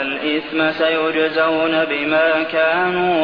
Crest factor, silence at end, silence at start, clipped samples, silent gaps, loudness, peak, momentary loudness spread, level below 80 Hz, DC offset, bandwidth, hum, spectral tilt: 14 dB; 0 s; 0 s; under 0.1%; none; -17 LUFS; -4 dBFS; 3 LU; -58 dBFS; 0.2%; 5.4 kHz; none; -7 dB/octave